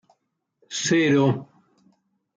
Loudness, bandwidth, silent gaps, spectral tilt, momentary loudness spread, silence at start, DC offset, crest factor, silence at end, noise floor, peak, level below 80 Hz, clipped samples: -22 LUFS; 9.4 kHz; none; -5 dB/octave; 13 LU; 0.7 s; under 0.1%; 16 dB; 0.9 s; -74 dBFS; -8 dBFS; -70 dBFS; under 0.1%